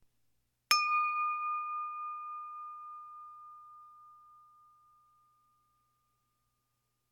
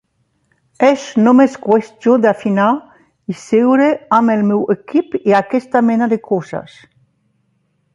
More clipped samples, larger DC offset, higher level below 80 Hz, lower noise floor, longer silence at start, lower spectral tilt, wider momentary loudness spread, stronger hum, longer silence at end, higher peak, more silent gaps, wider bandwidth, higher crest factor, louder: neither; neither; second, -84 dBFS vs -62 dBFS; first, -81 dBFS vs -63 dBFS; about the same, 0.7 s vs 0.8 s; second, 3 dB/octave vs -7 dB/octave; first, 24 LU vs 9 LU; first, 60 Hz at -85 dBFS vs none; first, 2.7 s vs 1.35 s; second, -10 dBFS vs 0 dBFS; neither; first, 16.5 kHz vs 7.8 kHz; first, 28 dB vs 14 dB; second, -33 LUFS vs -14 LUFS